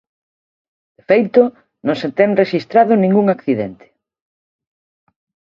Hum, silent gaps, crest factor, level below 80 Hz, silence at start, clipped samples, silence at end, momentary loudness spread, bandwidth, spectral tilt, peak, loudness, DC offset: none; none; 18 dB; -62 dBFS; 1.1 s; under 0.1%; 1.85 s; 9 LU; 7 kHz; -8.5 dB/octave; 0 dBFS; -15 LUFS; under 0.1%